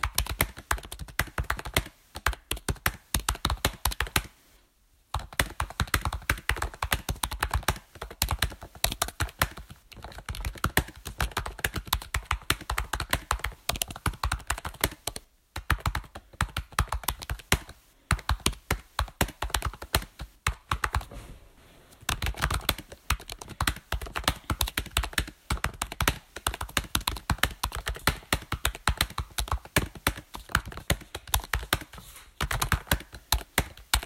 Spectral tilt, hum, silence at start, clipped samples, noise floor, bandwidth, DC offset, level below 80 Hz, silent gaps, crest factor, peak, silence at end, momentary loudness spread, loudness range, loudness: -3 dB/octave; none; 0 s; under 0.1%; -64 dBFS; 16.5 kHz; under 0.1%; -36 dBFS; none; 28 dB; -4 dBFS; 0 s; 9 LU; 2 LU; -30 LUFS